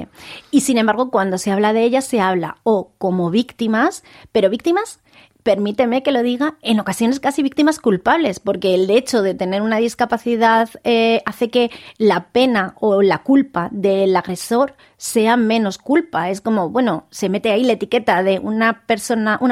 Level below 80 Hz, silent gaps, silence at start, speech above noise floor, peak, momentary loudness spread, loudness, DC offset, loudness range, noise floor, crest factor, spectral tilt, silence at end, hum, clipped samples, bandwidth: -58 dBFS; none; 0 s; 21 dB; -2 dBFS; 5 LU; -17 LUFS; under 0.1%; 2 LU; -37 dBFS; 14 dB; -5 dB/octave; 0 s; none; under 0.1%; 15.5 kHz